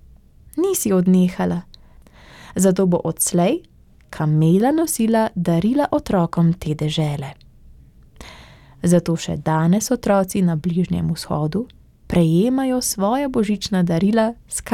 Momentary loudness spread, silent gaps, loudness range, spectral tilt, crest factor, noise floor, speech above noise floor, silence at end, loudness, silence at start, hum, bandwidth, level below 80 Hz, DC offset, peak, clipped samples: 8 LU; none; 4 LU; -6 dB/octave; 16 dB; -46 dBFS; 28 dB; 0 s; -19 LUFS; 0.55 s; none; 16 kHz; -44 dBFS; under 0.1%; -4 dBFS; under 0.1%